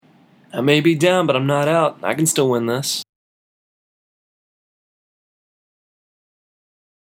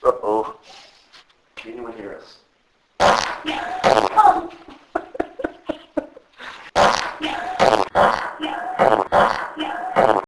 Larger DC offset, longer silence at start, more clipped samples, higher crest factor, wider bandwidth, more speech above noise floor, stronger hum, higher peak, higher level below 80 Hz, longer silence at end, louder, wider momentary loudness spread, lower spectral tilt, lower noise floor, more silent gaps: neither; first, 0.55 s vs 0 s; neither; about the same, 22 dB vs 20 dB; first, 17 kHz vs 11 kHz; second, 35 dB vs 43 dB; neither; about the same, 0 dBFS vs 0 dBFS; second, -76 dBFS vs -50 dBFS; first, 4 s vs 0 s; about the same, -17 LUFS vs -19 LUFS; second, 7 LU vs 19 LU; about the same, -4.5 dB/octave vs -3.5 dB/octave; second, -52 dBFS vs -62 dBFS; neither